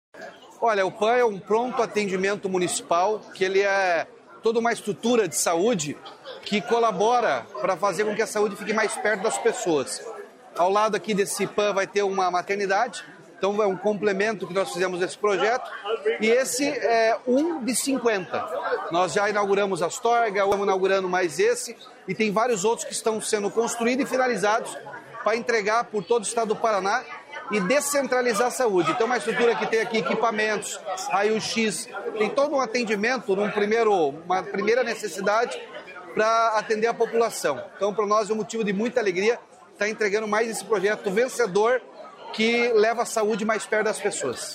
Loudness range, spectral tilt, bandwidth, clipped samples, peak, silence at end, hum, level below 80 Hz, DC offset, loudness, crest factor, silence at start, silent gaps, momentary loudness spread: 2 LU; -3.5 dB/octave; 16 kHz; under 0.1%; -8 dBFS; 0 s; none; -70 dBFS; under 0.1%; -24 LUFS; 16 dB; 0.15 s; none; 7 LU